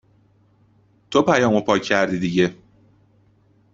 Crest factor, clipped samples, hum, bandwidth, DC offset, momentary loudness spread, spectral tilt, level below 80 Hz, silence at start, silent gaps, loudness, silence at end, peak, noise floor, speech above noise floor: 20 dB; under 0.1%; none; 7.8 kHz; under 0.1%; 5 LU; -5.5 dB/octave; -58 dBFS; 1.1 s; none; -19 LUFS; 1.2 s; -2 dBFS; -58 dBFS; 39 dB